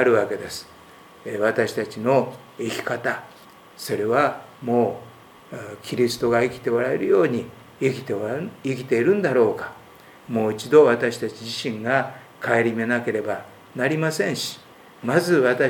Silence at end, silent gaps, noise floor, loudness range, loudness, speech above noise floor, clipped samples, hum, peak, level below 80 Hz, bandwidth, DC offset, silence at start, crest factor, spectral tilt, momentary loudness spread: 0 s; none; -47 dBFS; 4 LU; -23 LUFS; 25 dB; under 0.1%; none; -2 dBFS; -64 dBFS; 19.5 kHz; under 0.1%; 0 s; 20 dB; -5.5 dB/octave; 14 LU